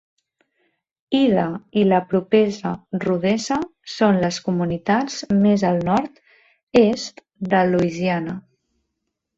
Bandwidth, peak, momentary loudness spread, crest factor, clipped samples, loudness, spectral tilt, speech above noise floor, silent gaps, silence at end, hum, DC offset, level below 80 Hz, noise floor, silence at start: 7.8 kHz; -4 dBFS; 11 LU; 18 dB; under 0.1%; -20 LUFS; -6 dB/octave; 59 dB; 6.63-6.67 s; 1 s; none; under 0.1%; -56 dBFS; -78 dBFS; 1.1 s